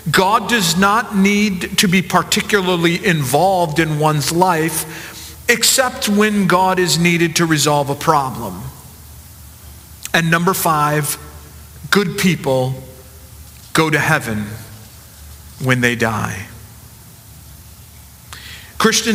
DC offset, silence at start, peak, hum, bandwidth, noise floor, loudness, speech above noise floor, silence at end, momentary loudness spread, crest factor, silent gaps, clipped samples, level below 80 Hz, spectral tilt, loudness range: under 0.1%; 0 s; 0 dBFS; none; 16 kHz; -40 dBFS; -15 LUFS; 25 dB; 0 s; 16 LU; 18 dB; none; under 0.1%; -44 dBFS; -4 dB/octave; 8 LU